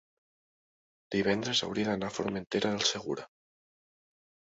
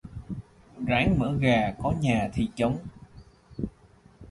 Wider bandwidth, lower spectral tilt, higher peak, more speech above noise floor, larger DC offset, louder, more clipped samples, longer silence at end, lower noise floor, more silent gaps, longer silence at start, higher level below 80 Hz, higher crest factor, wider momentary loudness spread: second, 8 kHz vs 11.5 kHz; second, -3.5 dB/octave vs -7 dB/octave; about the same, -12 dBFS vs -10 dBFS; first, over 59 dB vs 31 dB; neither; second, -31 LUFS vs -27 LUFS; neither; first, 1.35 s vs 0 s; first, under -90 dBFS vs -56 dBFS; neither; first, 1.1 s vs 0.05 s; second, -66 dBFS vs -44 dBFS; about the same, 22 dB vs 18 dB; second, 8 LU vs 17 LU